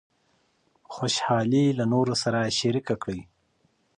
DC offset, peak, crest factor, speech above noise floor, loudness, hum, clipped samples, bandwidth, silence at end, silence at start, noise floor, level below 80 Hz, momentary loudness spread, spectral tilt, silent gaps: under 0.1%; -10 dBFS; 16 dB; 44 dB; -25 LUFS; none; under 0.1%; 10.5 kHz; 0.75 s; 0.9 s; -68 dBFS; -60 dBFS; 11 LU; -5 dB/octave; none